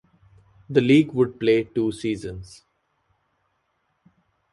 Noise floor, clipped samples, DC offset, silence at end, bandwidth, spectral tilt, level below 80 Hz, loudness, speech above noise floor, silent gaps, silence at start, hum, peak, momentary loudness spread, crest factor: -72 dBFS; under 0.1%; under 0.1%; 2.05 s; 11.5 kHz; -7 dB/octave; -56 dBFS; -21 LUFS; 51 dB; none; 0.7 s; none; -4 dBFS; 14 LU; 20 dB